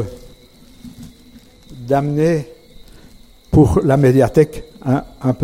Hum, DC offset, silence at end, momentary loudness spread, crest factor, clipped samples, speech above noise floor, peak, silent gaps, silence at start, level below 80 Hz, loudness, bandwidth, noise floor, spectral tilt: none; under 0.1%; 0 s; 22 LU; 16 dB; under 0.1%; 30 dB; 0 dBFS; none; 0 s; -34 dBFS; -15 LUFS; 15.5 kHz; -44 dBFS; -8.5 dB/octave